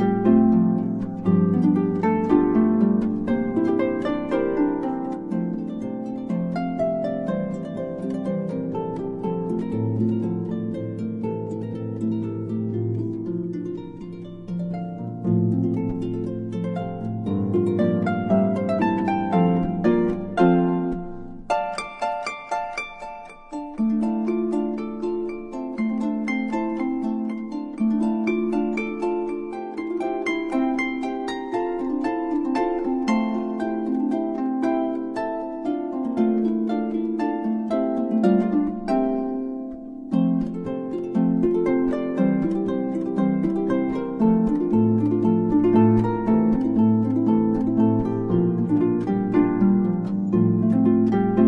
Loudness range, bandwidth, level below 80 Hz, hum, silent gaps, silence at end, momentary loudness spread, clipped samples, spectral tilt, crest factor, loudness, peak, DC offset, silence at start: 7 LU; 8.8 kHz; -50 dBFS; none; none; 0 s; 10 LU; under 0.1%; -9 dB/octave; 18 dB; -23 LUFS; -4 dBFS; under 0.1%; 0 s